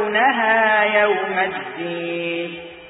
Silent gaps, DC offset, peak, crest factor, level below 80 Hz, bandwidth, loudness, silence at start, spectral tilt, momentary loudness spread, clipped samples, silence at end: none; under 0.1%; -4 dBFS; 16 dB; -62 dBFS; 4 kHz; -18 LUFS; 0 s; -9 dB/octave; 12 LU; under 0.1%; 0 s